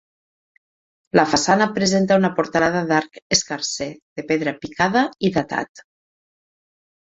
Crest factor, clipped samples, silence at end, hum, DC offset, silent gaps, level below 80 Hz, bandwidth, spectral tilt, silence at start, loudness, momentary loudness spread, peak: 20 dB; under 0.1%; 1.4 s; none; under 0.1%; 3.22-3.30 s, 4.02-4.16 s, 5.69-5.75 s; -56 dBFS; 8 kHz; -4 dB/octave; 1.15 s; -20 LUFS; 10 LU; -2 dBFS